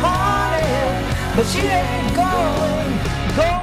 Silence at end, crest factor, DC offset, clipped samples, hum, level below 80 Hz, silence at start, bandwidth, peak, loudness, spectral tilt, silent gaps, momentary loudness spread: 0 s; 14 dB; under 0.1%; under 0.1%; none; -28 dBFS; 0 s; 16 kHz; -4 dBFS; -19 LUFS; -5.5 dB/octave; none; 3 LU